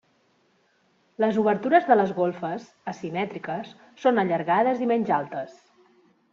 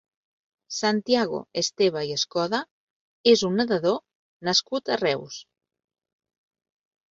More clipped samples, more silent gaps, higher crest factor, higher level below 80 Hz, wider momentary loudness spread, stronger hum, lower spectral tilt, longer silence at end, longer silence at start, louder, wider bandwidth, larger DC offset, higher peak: neither; second, none vs 2.71-3.24 s, 4.15-4.40 s; about the same, 20 dB vs 20 dB; about the same, -70 dBFS vs -68 dBFS; first, 14 LU vs 11 LU; neither; first, -5 dB/octave vs -3.5 dB/octave; second, 0.8 s vs 1.7 s; first, 1.2 s vs 0.7 s; about the same, -24 LUFS vs -24 LUFS; about the same, 7.2 kHz vs 7.8 kHz; neither; about the same, -6 dBFS vs -6 dBFS